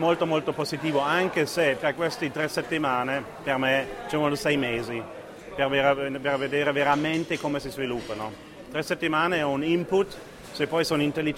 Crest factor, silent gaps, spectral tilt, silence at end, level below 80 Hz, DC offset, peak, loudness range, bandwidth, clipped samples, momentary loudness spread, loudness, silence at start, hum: 18 dB; none; -5 dB/octave; 0 s; -56 dBFS; under 0.1%; -8 dBFS; 2 LU; 16 kHz; under 0.1%; 10 LU; -26 LUFS; 0 s; none